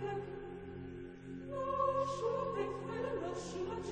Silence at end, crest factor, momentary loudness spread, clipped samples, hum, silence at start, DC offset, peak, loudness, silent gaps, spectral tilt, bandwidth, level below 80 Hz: 0 s; 16 dB; 13 LU; under 0.1%; none; 0 s; under 0.1%; -24 dBFS; -40 LUFS; none; -6 dB/octave; 9.4 kHz; -60 dBFS